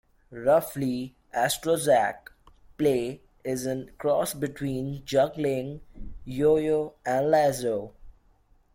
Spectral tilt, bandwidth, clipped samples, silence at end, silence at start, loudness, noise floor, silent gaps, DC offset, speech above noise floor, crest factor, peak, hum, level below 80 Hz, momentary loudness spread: -5 dB/octave; 16.5 kHz; under 0.1%; 0.65 s; 0.3 s; -26 LUFS; -61 dBFS; none; under 0.1%; 36 dB; 16 dB; -10 dBFS; none; -52 dBFS; 14 LU